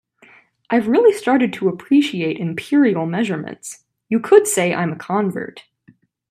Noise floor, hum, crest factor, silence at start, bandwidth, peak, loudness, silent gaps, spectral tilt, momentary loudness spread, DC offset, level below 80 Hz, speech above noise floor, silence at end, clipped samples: -54 dBFS; none; 18 dB; 0.7 s; 15.5 kHz; 0 dBFS; -17 LUFS; none; -5 dB/octave; 13 LU; under 0.1%; -66 dBFS; 37 dB; 0.7 s; under 0.1%